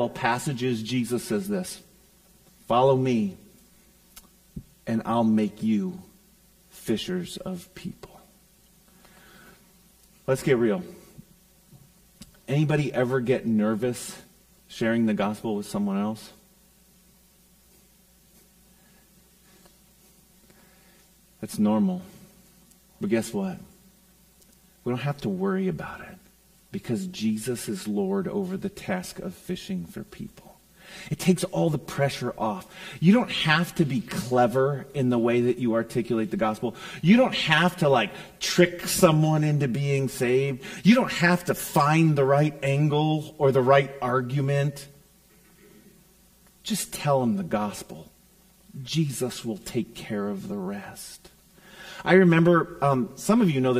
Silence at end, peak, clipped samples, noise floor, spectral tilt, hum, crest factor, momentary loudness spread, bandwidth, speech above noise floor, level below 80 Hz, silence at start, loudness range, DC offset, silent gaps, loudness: 0 s; -2 dBFS; under 0.1%; -58 dBFS; -6 dB/octave; none; 24 dB; 18 LU; 15.5 kHz; 34 dB; -58 dBFS; 0 s; 10 LU; under 0.1%; none; -25 LUFS